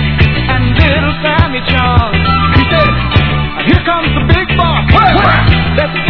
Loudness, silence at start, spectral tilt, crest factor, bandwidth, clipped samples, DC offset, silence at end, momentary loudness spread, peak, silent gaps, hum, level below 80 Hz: -10 LUFS; 0 s; -8.5 dB/octave; 10 dB; 5.4 kHz; 0.8%; under 0.1%; 0 s; 4 LU; 0 dBFS; none; none; -18 dBFS